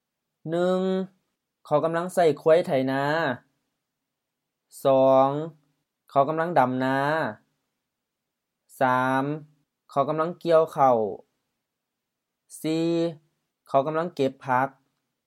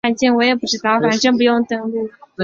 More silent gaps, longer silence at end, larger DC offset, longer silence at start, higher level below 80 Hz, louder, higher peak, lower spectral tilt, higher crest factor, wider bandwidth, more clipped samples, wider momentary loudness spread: neither; first, 0.55 s vs 0 s; neither; first, 0.45 s vs 0.05 s; second, -80 dBFS vs -58 dBFS; second, -24 LUFS vs -16 LUFS; second, -6 dBFS vs -2 dBFS; first, -6.5 dB/octave vs -4 dB/octave; first, 20 dB vs 14 dB; first, 15 kHz vs 7.4 kHz; neither; about the same, 11 LU vs 10 LU